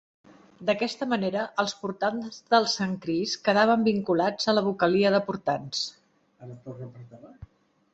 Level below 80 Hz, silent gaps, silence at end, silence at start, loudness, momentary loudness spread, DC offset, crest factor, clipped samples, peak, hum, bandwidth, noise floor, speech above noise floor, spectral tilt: -64 dBFS; none; 0.5 s; 0.6 s; -26 LUFS; 18 LU; under 0.1%; 22 dB; under 0.1%; -6 dBFS; none; 8.2 kHz; -53 dBFS; 27 dB; -4.5 dB/octave